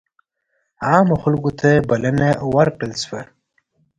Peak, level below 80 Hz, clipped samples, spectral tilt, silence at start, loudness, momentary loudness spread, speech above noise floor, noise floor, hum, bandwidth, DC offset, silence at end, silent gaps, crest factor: 0 dBFS; -46 dBFS; under 0.1%; -6.5 dB/octave; 0.8 s; -17 LUFS; 11 LU; 54 dB; -70 dBFS; none; 10.5 kHz; under 0.1%; 0.75 s; none; 18 dB